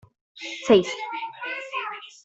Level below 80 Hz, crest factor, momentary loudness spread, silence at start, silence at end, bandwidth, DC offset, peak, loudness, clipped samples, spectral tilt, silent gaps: -66 dBFS; 22 dB; 15 LU; 0.35 s; 0.15 s; 8 kHz; under 0.1%; -4 dBFS; -25 LUFS; under 0.1%; -4.5 dB/octave; none